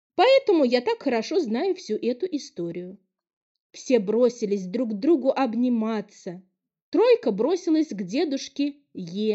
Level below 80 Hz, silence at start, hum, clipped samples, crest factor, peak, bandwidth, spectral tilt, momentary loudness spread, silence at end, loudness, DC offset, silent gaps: -78 dBFS; 0.2 s; none; under 0.1%; 16 dB; -8 dBFS; 8 kHz; -5.5 dB/octave; 15 LU; 0 s; -24 LUFS; under 0.1%; 3.33-3.70 s, 6.82-6.92 s